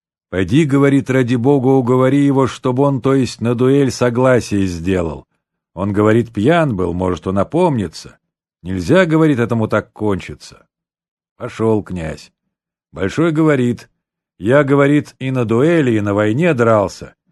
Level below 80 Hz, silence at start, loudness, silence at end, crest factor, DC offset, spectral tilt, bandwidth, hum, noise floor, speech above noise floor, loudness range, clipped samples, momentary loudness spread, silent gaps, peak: -40 dBFS; 0.3 s; -15 LUFS; 0.25 s; 14 dB; under 0.1%; -7 dB/octave; 12 kHz; none; -77 dBFS; 63 dB; 5 LU; under 0.1%; 13 LU; 11.08-11.17 s, 11.31-11.36 s; 0 dBFS